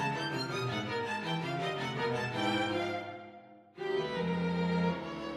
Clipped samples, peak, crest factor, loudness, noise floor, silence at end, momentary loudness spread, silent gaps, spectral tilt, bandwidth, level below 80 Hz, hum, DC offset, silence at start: under 0.1%; -20 dBFS; 16 dB; -34 LUFS; -54 dBFS; 0 s; 7 LU; none; -6 dB/octave; 13 kHz; -66 dBFS; none; under 0.1%; 0 s